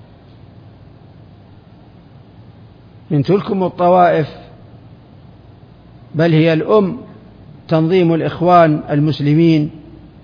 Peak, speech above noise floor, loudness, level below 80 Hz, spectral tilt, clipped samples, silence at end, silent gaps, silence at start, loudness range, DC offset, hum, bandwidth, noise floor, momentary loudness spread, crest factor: 0 dBFS; 29 dB; -14 LUFS; -50 dBFS; -9.5 dB/octave; under 0.1%; 0.25 s; none; 3.1 s; 7 LU; under 0.1%; none; 5.2 kHz; -42 dBFS; 10 LU; 16 dB